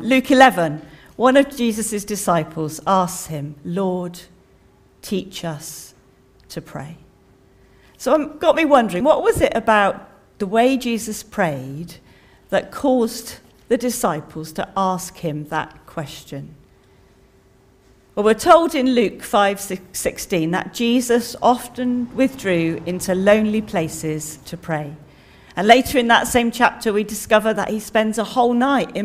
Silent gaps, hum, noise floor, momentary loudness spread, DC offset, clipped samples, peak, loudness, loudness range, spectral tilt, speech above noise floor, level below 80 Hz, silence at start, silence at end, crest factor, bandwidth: none; none; -53 dBFS; 17 LU; under 0.1%; under 0.1%; 0 dBFS; -19 LUFS; 10 LU; -4.5 dB/octave; 34 dB; -48 dBFS; 0 s; 0 s; 20 dB; 16 kHz